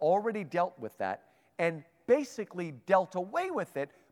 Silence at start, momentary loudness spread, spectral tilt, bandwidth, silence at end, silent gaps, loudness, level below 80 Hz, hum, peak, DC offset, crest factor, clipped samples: 0 s; 11 LU; -6 dB/octave; 15 kHz; 0.25 s; none; -32 LUFS; -82 dBFS; none; -12 dBFS; under 0.1%; 20 dB; under 0.1%